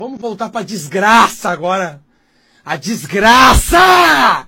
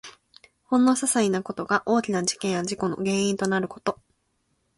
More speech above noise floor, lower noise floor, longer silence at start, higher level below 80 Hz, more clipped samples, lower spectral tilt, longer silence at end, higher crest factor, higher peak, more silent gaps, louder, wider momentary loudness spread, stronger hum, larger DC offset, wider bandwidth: second, 43 dB vs 48 dB; second, -55 dBFS vs -72 dBFS; about the same, 0 s vs 0.05 s; first, -26 dBFS vs -64 dBFS; first, 0.6% vs under 0.1%; about the same, -3 dB/octave vs -4 dB/octave; second, 0.05 s vs 0.85 s; about the same, 12 dB vs 16 dB; first, 0 dBFS vs -8 dBFS; neither; first, -10 LUFS vs -24 LUFS; first, 16 LU vs 9 LU; neither; neither; first, over 20 kHz vs 11.5 kHz